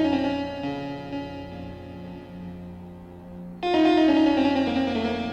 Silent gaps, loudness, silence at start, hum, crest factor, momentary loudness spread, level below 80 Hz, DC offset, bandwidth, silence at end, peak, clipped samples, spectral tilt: none; -24 LUFS; 0 s; 60 Hz at -60 dBFS; 16 dB; 21 LU; -52 dBFS; under 0.1%; 8.2 kHz; 0 s; -10 dBFS; under 0.1%; -6.5 dB/octave